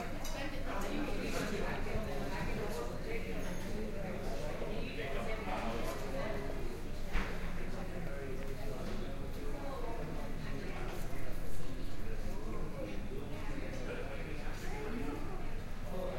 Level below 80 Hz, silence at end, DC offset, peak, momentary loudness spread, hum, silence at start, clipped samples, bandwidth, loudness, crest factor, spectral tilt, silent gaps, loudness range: -40 dBFS; 0 s; under 0.1%; -20 dBFS; 6 LU; none; 0 s; under 0.1%; 15.5 kHz; -42 LUFS; 16 dB; -5.5 dB/octave; none; 4 LU